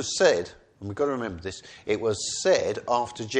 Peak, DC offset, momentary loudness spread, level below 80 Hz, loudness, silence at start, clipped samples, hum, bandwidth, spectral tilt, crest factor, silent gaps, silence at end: -8 dBFS; under 0.1%; 16 LU; -58 dBFS; -26 LUFS; 0 s; under 0.1%; none; 9.8 kHz; -3 dB/octave; 20 dB; none; 0 s